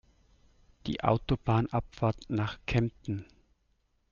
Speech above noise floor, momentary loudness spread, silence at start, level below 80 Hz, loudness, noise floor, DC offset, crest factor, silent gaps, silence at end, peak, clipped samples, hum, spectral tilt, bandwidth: 43 dB; 10 LU; 0.85 s; -48 dBFS; -31 LUFS; -73 dBFS; under 0.1%; 22 dB; none; 0.9 s; -10 dBFS; under 0.1%; none; -8 dB/octave; 7.2 kHz